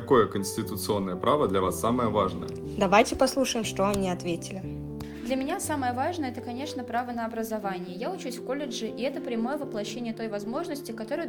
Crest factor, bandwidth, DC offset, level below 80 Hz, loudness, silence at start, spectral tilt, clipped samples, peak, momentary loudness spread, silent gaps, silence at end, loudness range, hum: 22 dB; 19 kHz; under 0.1%; -52 dBFS; -29 LUFS; 0 s; -5 dB/octave; under 0.1%; -8 dBFS; 11 LU; none; 0 s; 7 LU; none